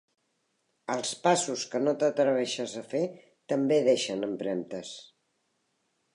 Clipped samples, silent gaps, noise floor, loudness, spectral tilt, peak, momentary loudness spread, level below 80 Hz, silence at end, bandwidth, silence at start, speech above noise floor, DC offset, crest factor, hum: under 0.1%; none; -76 dBFS; -28 LUFS; -4 dB/octave; -12 dBFS; 13 LU; -80 dBFS; 1.1 s; 11 kHz; 0.9 s; 48 dB; under 0.1%; 18 dB; none